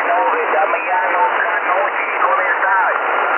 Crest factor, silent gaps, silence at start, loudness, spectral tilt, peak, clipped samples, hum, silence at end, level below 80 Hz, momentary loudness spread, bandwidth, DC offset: 12 dB; none; 0 s; -15 LUFS; -5 dB/octave; -4 dBFS; under 0.1%; none; 0 s; under -90 dBFS; 2 LU; 3.4 kHz; under 0.1%